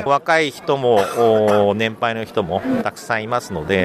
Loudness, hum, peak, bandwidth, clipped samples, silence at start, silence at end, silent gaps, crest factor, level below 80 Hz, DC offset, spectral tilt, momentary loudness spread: -18 LUFS; none; -4 dBFS; 15 kHz; under 0.1%; 0 s; 0 s; none; 14 dB; -52 dBFS; under 0.1%; -5.5 dB/octave; 8 LU